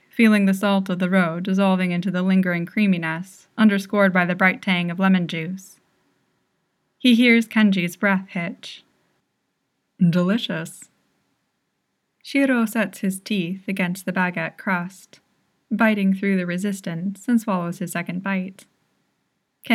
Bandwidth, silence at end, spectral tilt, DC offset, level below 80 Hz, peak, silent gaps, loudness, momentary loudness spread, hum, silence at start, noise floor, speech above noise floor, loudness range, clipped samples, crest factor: 14.5 kHz; 0 s; -6 dB/octave; under 0.1%; -82 dBFS; -2 dBFS; none; -21 LUFS; 11 LU; none; 0.15 s; -74 dBFS; 53 dB; 6 LU; under 0.1%; 20 dB